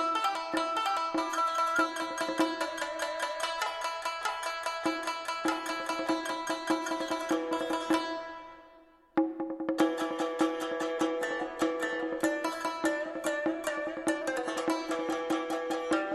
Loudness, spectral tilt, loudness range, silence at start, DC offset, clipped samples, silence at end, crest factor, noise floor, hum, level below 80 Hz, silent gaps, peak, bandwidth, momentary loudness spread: -32 LUFS; -2.5 dB/octave; 2 LU; 0 s; under 0.1%; under 0.1%; 0 s; 18 dB; -58 dBFS; none; -68 dBFS; none; -14 dBFS; 13 kHz; 4 LU